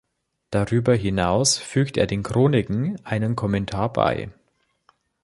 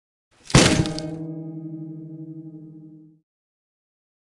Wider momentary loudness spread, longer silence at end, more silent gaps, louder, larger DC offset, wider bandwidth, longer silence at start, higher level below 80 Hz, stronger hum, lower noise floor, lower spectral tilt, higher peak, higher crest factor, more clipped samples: second, 7 LU vs 24 LU; second, 0.9 s vs 1.25 s; neither; about the same, -22 LUFS vs -20 LUFS; neither; about the same, 11.5 kHz vs 11.5 kHz; about the same, 0.5 s vs 0.45 s; about the same, -44 dBFS vs -42 dBFS; neither; first, -68 dBFS vs -46 dBFS; about the same, -5 dB/octave vs -4 dB/octave; about the same, -2 dBFS vs 0 dBFS; about the same, 20 dB vs 24 dB; neither